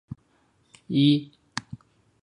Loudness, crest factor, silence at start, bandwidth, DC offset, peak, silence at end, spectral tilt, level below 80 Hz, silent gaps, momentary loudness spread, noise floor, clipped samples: -25 LUFS; 20 dB; 0.9 s; 10.5 kHz; under 0.1%; -8 dBFS; 0.45 s; -6 dB/octave; -62 dBFS; none; 25 LU; -65 dBFS; under 0.1%